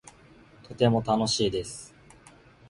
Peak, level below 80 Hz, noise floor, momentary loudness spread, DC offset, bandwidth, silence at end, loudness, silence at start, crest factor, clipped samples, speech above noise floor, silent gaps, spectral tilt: -8 dBFS; -54 dBFS; -54 dBFS; 22 LU; under 0.1%; 11.5 kHz; 0.8 s; -26 LUFS; 0.7 s; 20 dB; under 0.1%; 28 dB; none; -5 dB/octave